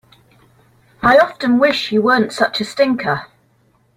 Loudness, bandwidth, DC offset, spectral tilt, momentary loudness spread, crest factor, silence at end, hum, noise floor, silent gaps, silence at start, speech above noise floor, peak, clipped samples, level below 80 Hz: -15 LUFS; 15.5 kHz; under 0.1%; -5 dB/octave; 7 LU; 16 dB; 0.7 s; none; -57 dBFS; none; 1 s; 43 dB; 0 dBFS; under 0.1%; -50 dBFS